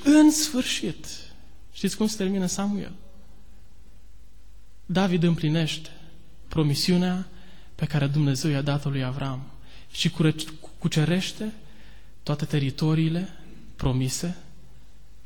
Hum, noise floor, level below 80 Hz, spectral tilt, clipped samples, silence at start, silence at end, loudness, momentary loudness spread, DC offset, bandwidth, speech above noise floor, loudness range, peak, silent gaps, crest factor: none; -51 dBFS; -48 dBFS; -5.5 dB/octave; under 0.1%; 0 s; 0.85 s; -25 LUFS; 15 LU; 1%; 19 kHz; 27 dB; 5 LU; -8 dBFS; none; 18 dB